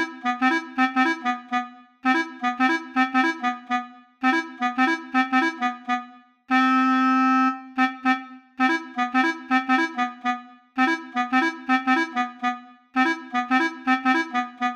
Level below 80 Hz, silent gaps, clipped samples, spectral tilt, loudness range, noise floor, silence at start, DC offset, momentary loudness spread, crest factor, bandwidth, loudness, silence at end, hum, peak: -78 dBFS; none; under 0.1%; -2.5 dB/octave; 2 LU; -45 dBFS; 0 s; under 0.1%; 9 LU; 14 dB; 9.2 kHz; -23 LUFS; 0 s; none; -10 dBFS